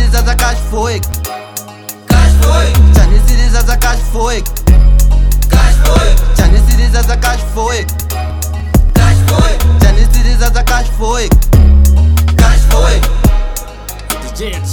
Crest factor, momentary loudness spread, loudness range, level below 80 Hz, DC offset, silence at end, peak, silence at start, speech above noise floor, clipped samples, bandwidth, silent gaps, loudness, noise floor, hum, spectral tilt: 8 dB; 11 LU; 2 LU; -8 dBFS; under 0.1%; 0 s; 0 dBFS; 0 s; 20 dB; 0.1%; 20 kHz; none; -11 LUFS; -28 dBFS; none; -5 dB/octave